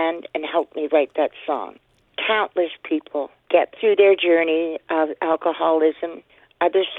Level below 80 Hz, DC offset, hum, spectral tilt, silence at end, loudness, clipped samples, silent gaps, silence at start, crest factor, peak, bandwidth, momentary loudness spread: -70 dBFS; under 0.1%; none; -6.5 dB/octave; 0 s; -21 LUFS; under 0.1%; none; 0 s; 18 dB; -4 dBFS; 4.1 kHz; 12 LU